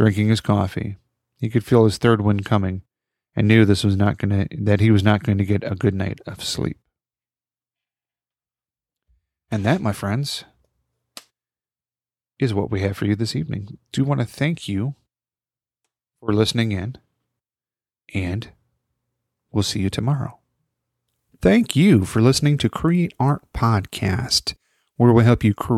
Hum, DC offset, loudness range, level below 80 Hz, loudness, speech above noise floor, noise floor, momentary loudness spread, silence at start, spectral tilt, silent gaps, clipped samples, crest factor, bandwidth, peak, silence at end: none; under 0.1%; 9 LU; -46 dBFS; -20 LUFS; over 71 dB; under -90 dBFS; 13 LU; 0 s; -6 dB/octave; none; under 0.1%; 20 dB; 13.5 kHz; -2 dBFS; 0 s